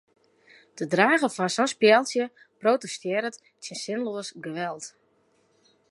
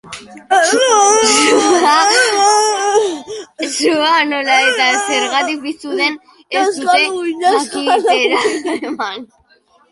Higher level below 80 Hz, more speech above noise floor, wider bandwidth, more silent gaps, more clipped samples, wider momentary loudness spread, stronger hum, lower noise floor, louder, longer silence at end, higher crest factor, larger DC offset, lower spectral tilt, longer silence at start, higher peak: second, -80 dBFS vs -60 dBFS; about the same, 41 dB vs 39 dB; about the same, 11.5 kHz vs 11.5 kHz; neither; neither; first, 16 LU vs 13 LU; neither; first, -66 dBFS vs -53 dBFS; second, -25 LUFS vs -13 LUFS; first, 1 s vs 0.65 s; first, 22 dB vs 14 dB; neither; first, -3.5 dB/octave vs -0.5 dB/octave; first, 0.75 s vs 0.05 s; second, -4 dBFS vs 0 dBFS